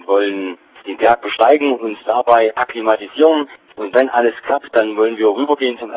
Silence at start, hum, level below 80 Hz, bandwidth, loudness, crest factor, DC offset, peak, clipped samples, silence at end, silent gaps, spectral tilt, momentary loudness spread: 0.1 s; none; -60 dBFS; 4 kHz; -15 LUFS; 16 dB; under 0.1%; 0 dBFS; under 0.1%; 0 s; none; -7.5 dB/octave; 10 LU